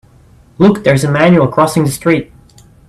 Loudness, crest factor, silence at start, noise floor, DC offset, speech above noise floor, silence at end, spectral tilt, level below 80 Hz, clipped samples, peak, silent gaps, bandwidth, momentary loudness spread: -11 LUFS; 12 dB; 0.6 s; -44 dBFS; under 0.1%; 34 dB; 0.65 s; -6.5 dB/octave; -44 dBFS; under 0.1%; 0 dBFS; none; 14 kHz; 5 LU